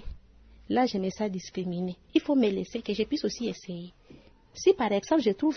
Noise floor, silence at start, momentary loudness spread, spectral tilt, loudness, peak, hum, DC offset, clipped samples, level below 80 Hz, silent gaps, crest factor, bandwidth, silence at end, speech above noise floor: -54 dBFS; 0 s; 15 LU; -5.5 dB/octave; -28 LUFS; -10 dBFS; none; under 0.1%; under 0.1%; -52 dBFS; none; 18 dB; 6.6 kHz; 0 s; 27 dB